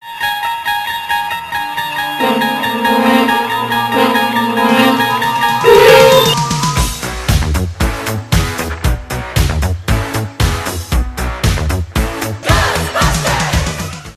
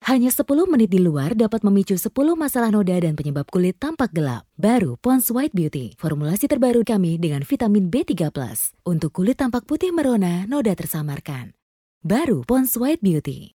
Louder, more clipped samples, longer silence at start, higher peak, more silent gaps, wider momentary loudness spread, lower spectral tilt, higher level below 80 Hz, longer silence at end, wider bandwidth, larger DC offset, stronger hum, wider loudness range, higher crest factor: first, -13 LUFS vs -20 LUFS; first, 0.2% vs under 0.1%; about the same, 0.05 s vs 0.05 s; first, 0 dBFS vs -4 dBFS; second, none vs 11.62-12.01 s; about the same, 9 LU vs 7 LU; second, -4.5 dB/octave vs -6.5 dB/octave; first, -22 dBFS vs -52 dBFS; about the same, 0.05 s vs 0.1 s; second, 16 kHz vs 18.5 kHz; neither; neither; first, 7 LU vs 3 LU; about the same, 14 dB vs 16 dB